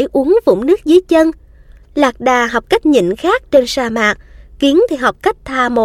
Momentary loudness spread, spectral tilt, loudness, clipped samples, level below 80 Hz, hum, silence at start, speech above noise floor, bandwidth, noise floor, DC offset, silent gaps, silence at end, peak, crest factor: 6 LU; -4.5 dB/octave; -13 LUFS; under 0.1%; -40 dBFS; none; 0 s; 28 dB; 15.5 kHz; -41 dBFS; under 0.1%; none; 0 s; 0 dBFS; 12 dB